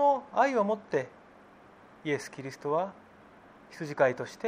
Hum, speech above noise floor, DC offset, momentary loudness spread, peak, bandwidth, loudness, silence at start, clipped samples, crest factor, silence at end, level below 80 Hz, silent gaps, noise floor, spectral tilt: none; 25 dB; under 0.1%; 15 LU; -10 dBFS; 14.5 kHz; -30 LUFS; 0 s; under 0.1%; 22 dB; 0 s; -74 dBFS; none; -55 dBFS; -5.5 dB/octave